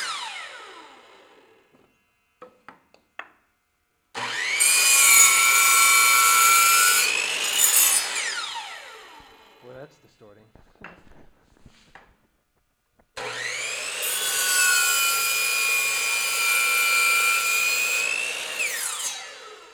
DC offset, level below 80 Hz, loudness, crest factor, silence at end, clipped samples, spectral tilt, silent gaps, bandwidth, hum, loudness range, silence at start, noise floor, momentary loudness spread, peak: under 0.1%; -68 dBFS; -18 LUFS; 18 dB; 0.15 s; under 0.1%; 3 dB/octave; none; over 20 kHz; none; 18 LU; 0 s; -71 dBFS; 18 LU; -6 dBFS